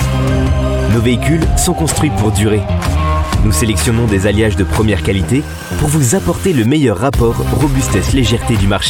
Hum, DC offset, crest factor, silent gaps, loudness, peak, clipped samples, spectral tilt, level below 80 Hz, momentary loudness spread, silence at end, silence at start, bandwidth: none; under 0.1%; 10 dB; none; -13 LUFS; -2 dBFS; under 0.1%; -5.5 dB/octave; -20 dBFS; 3 LU; 0 s; 0 s; 17 kHz